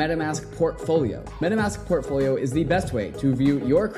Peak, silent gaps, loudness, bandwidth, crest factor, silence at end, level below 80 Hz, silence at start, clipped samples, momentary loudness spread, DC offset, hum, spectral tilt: -10 dBFS; none; -24 LUFS; 13 kHz; 14 dB; 0 s; -42 dBFS; 0 s; under 0.1%; 6 LU; under 0.1%; none; -6.5 dB/octave